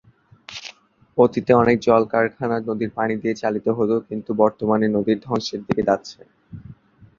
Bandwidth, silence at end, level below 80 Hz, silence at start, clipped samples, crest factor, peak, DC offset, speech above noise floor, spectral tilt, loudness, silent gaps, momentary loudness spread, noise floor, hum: 7.4 kHz; 0.45 s; -54 dBFS; 0.5 s; under 0.1%; 20 dB; -2 dBFS; under 0.1%; 29 dB; -6.5 dB/octave; -20 LUFS; none; 19 LU; -48 dBFS; none